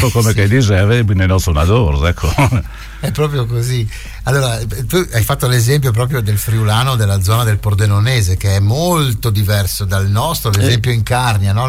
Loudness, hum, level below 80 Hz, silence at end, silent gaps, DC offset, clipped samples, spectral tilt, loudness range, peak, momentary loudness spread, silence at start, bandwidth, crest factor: -14 LUFS; none; -26 dBFS; 0 s; none; under 0.1%; under 0.1%; -5.5 dB/octave; 3 LU; -2 dBFS; 5 LU; 0 s; 16.5 kHz; 10 dB